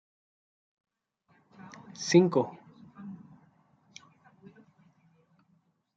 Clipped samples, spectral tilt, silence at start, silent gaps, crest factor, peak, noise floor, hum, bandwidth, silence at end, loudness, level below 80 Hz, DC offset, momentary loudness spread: under 0.1%; -5.5 dB/octave; 2 s; none; 26 dB; -8 dBFS; -71 dBFS; none; 7.8 kHz; 2.8 s; -26 LUFS; -80 dBFS; under 0.1%; 30 LU